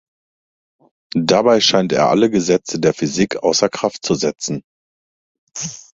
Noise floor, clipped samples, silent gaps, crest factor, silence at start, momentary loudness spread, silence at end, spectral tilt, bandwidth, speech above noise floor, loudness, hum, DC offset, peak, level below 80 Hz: under -90 dBFS; under 0.1%; 4.64-5.47 s; 18 dB; 1.15 s; 14 LU; 0.2 s; -4 dB/octave; 8 kHz; over 74 dB; -16 LUFS; none; under 0.1%; 0 dBFS; -54 dBFS